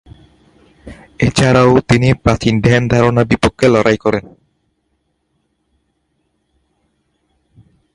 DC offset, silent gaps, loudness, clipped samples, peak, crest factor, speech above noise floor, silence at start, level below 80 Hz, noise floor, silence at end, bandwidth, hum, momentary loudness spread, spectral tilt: under 0.1%; none; -12 LUFS; under 0.1%; 0 dBFS; 16 dB; 54 dB; 0.85 s; -36 dBFS; -66 dBFS; 3.75 s; 11.5 kHz; none; 6 LU; -6.5 dB/octave